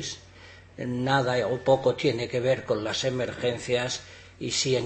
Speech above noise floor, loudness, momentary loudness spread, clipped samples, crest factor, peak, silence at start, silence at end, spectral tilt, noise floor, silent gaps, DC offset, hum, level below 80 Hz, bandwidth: 23 dB; -27 LUFS; 13 LU; under 0.1%; 20 dB; -8 dBFS; 0 s; 0 s; -4.5 dB/octave; -49 dBFS; none; under 0.1%; none; -58 dBFS; 8.8 kHz